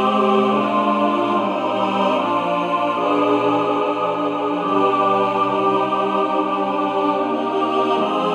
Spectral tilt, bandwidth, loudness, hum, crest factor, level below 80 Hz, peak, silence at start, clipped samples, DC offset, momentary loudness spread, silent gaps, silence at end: -6.5 dB/octave; 10.5 kHz; -19 LUFS; none; 14 dB; -70 dBFS; -4 dBFS; 0 s; under 0.1%; under 0.1%; 4 LU; none; 0 s